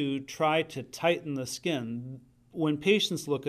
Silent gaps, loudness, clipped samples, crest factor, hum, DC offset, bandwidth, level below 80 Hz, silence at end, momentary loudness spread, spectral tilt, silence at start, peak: none; -29 LUFS; under 0.1%; 18 dB; none; under 0.1%; 15.5 kHz; -68 dBFS; 0 s; 14 LU; -4.5 dB/octave; 0 s; -12 dBFS